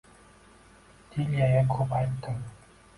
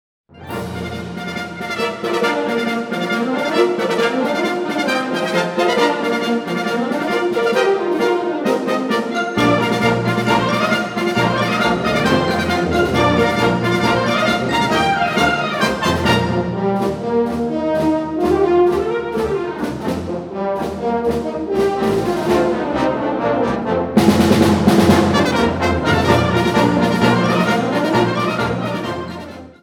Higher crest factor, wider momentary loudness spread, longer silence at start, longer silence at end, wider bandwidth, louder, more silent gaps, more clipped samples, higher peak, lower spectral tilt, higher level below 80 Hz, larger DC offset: about the same, 16 dB vs 16 dB; first, 14 LU vs 8 LU; first, 1.1 s vs 0.35 s; first, 0.45 s vs 0.1 s; second, 11.5 kHz vs 18.5 kHz; second, -28 LUFS vs -17 LUFS; neither; neither; second, -12 dBFS vs 0 dBFS; first, -8.5 dB/octave vs -5.5 dB/octave; second, -52 dBFS vs -40 dBFS; neither